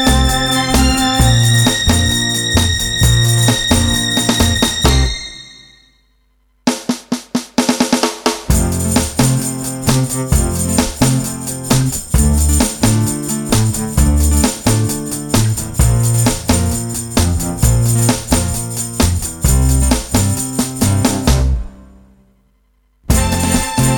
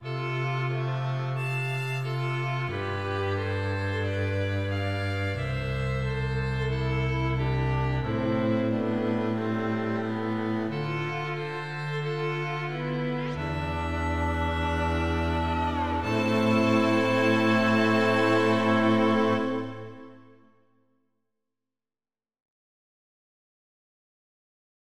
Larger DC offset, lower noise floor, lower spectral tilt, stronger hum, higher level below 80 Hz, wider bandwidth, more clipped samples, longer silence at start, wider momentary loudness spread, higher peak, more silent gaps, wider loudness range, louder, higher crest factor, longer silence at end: second, under 0.1% vs 0.3%; second, -57 dBFS vs under -90 dBFS; second, -4 dB/octave vs -7 dB/octave; neither; first, -20 dBFS vs -42 dBFS; first, over 20 kHz vs 12.5 kHz; neither; about the same, 0 s vs 0 s; about the same, 7 LU vs 8 LU; first, 0 dBFS vs -10 dBFS; neither; about the same, 5 LU vs 7 LU; first, -14 LUFS vs -27 LUFS; about the same, 14 dB vs 16 dB; second, 0 s vs 2.55 s